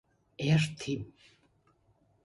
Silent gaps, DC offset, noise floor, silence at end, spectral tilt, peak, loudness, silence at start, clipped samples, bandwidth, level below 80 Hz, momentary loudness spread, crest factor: none; under 0.1%; -69 dBFS; 1.15 s; -6 dB/octave; -16 dBFS; -31 LUFS; 0.4 s; under 0.1%; 11.5 kHz; -62 dBFS; 12 LU; 18 dB